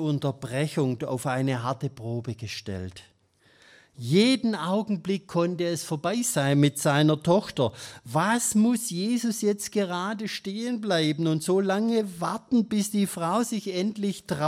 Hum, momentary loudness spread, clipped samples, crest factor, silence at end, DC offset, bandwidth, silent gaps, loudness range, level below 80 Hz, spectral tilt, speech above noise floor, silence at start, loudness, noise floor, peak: none; 10 LU; under 0.1%; 18 dB; 0 s; under 0.1%; 16 kHz; none; 5 LU; -66 dBFS; -5 dB/octave; 36 dB; 0 s; -26 LUFS; -62 dBFS; -8 dBFS